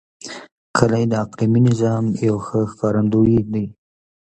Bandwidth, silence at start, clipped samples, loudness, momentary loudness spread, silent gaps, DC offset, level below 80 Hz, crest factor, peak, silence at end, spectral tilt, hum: 8.8 kHz; 0.25 s; under 0.1%; -18 LUFS; 16 LU; 0.52-0.74 s; under 0.1%; -46 dBFS; 18 dB; 0 dBFS; 0.6 s; -7.5 dB/octave; none